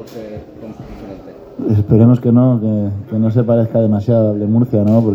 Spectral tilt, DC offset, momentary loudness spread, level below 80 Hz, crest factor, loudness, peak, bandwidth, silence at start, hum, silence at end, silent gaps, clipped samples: -11.5 dB/octave; under 0.1%; 22 LU; -44 dBFS; 14 dB; -13 LUFS; 0 dBFS; 5.6 kHz; 0 s; none; 0 s; none; under 0.1%